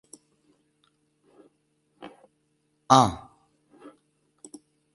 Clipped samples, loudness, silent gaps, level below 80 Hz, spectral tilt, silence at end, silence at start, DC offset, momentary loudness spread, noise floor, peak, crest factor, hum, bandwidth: under 0.1%; -21 LUFS; none; -58 dBFS; -5 dB/octave; 1.8 s; 2.9 s; under 0.1%; 29 LU; -72 dBFS; -2 dBFS; 30 dB; none; 11.5 kHz